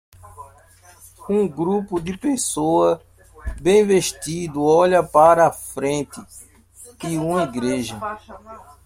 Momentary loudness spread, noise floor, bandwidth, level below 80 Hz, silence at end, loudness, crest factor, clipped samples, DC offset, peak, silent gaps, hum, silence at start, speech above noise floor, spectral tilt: 19 LU; -49 dBFS; 16.5 kHz; -44 dBFS; 0.25 s; -19 LUFS; 18 dB; under 0.1%; under 0.1%; -2 dBFS; none; none; 0.25 s; 30 dB; -5 dB/octave